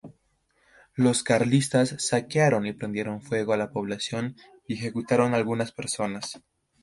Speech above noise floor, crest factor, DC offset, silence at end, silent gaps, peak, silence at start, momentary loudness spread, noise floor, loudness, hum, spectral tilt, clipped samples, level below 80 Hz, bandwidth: 43 dB; 20 dB; under 0.1%; 0.45 s; none; -6 dBFS; 0.05 s; 12 LU; -69 dBFS; -26 LUFS; none; -5 dB/octave; under 0.1%; -64 dBFS; 11.5 kHz